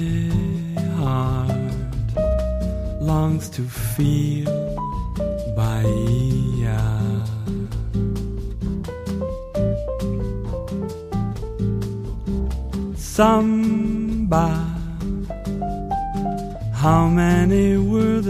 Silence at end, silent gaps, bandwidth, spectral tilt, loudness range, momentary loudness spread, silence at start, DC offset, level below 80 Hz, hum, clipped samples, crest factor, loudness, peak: 0 s; none; 15.5 kHz; -7.5 dB/octave; 5 LU; 11 LU; 0 s; under 0.1%; -30 dBFS; none; under 0.1%; 18 dB; -22 LUFS; -4 dBFS